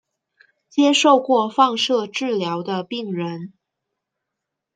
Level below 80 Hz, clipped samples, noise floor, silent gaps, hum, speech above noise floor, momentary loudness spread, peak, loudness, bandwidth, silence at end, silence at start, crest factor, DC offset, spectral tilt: -74 dBFS; under 0.1%; -82 dBFS; none; none; 63 dB; 12 LU; -2 dBFS; -19 LUFS; 9.4 kHz; 1.3 s; 0.75 s; 20 dB; under 0.1%; -4 dB/octave